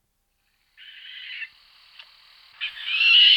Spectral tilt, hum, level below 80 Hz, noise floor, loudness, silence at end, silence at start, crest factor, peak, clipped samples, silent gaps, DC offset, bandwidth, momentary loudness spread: 4 dB/octave; none; -72 dBFS; -72 dBFS; -19 LUFS; 0 s; 1.1 s; 20 dB; -4 dBFS; under 0.1%; none; under 0.1%; 9.4 kHz; 25 LU